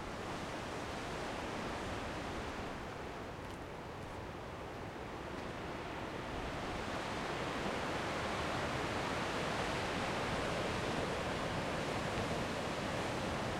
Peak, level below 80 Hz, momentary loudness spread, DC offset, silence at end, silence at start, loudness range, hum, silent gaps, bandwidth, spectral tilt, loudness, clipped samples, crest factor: -24 dBFS; -54 dBFS; 8 LU; under 0.1%; 0 s; 0 s; 7 LU; none; none; 16.5 kHz; -4.5 dB/octave; -40 LUFS; under 0.1%; 16 dB